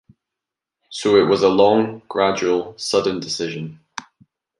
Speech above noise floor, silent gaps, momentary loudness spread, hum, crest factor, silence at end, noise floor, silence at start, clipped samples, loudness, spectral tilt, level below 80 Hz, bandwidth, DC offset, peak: 67 dB; none; 19 LU; none; 18 dB; 0.6 s; -85 dBFS; 0.9 s; under 0.1%; -18 LUFS; -4.5 dB/octave; -58 dBFS; 11.5 kHz; under 0.1%; -2 dBFS